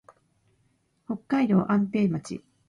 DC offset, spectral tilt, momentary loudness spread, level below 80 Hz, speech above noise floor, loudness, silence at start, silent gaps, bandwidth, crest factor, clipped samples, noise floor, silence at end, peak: under 0.1%; -8 dB/octave; 14 LU; -64 dBFS; 45 dB; -26 LUFS; 1.1 s; none; 11 kHz; 16 dB; under 0.1%; -69 dBFS; 0.3 s; -12 dBFS